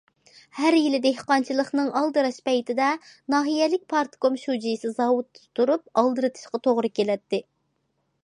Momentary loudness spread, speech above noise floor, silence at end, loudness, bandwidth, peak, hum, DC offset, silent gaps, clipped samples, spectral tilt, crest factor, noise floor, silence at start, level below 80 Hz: 6 LU; 50 dB; 0.85 s; -24 LUFS; 11 kHz; -6 dBFS; none; under 0.1%; none; under 0.1%; -4.5 dB/octave; 18 dB; -73 dBFS; 0.55 s; -78 dBFS